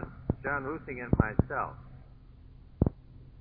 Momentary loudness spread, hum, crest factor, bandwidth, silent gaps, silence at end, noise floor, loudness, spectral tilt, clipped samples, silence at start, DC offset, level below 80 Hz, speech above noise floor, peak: 23 LU; none; 24 dB; 4.3 kHz; none; 0 s; -52 dBFS; -32 LUFS; -10 dB/octave; under 0.1%; 0 s; under 0.1%; -42 dBFS; 21 dB; -8 dBFS